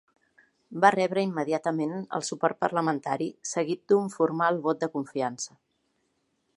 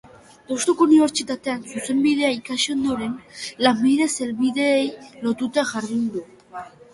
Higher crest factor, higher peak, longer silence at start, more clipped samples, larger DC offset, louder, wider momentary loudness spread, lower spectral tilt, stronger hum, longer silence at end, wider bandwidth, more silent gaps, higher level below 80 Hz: first, 24 dB vs 18 dB; about the same, -4 dBFS vs -2 dBFS; first, 0.7 s vs 0.5 s; neither; neither; second, -27 LUFS vs -21 LUFS; second, 9 LU vs 14 LU; first, -5 dB/octave vs -3.5 dB/octave; neither; first, 1.1 s vs 0.25 s; about the same, 11.5 kHz vs 11.5 kHz; neither; second, -78 dBFS vs -60 dBFS